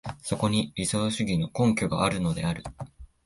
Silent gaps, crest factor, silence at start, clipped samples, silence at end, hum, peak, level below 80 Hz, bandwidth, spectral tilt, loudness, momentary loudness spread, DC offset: none; 16 dB; 0.05 s; under 0.1%; 0.2 s; none; -10 dBFS; -48 dBFS; 11.5 kHz; -5 dB/octave; -27 LUFS; 12 LU; under 0.1%